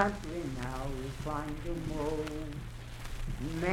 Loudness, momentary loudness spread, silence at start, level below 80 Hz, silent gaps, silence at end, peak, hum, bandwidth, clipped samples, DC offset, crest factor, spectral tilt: -38 LUFS; 9 LU; 0 s; -42 dBFS; none; 0 s; -10 dBFS; none; 16.5 kHz; under 0.1%; under 0.1%; 26 dB; -6 dB/octave